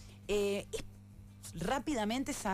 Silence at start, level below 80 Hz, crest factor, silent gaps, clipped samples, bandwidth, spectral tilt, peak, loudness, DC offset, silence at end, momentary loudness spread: 0 s; -52 dBFS; 14 dB; none; under 0.1%; 15.5 kHz; -4.5 dB/octave; -24 dBFS; -36 LUFS; under 0.1%; 0 s; 20 LU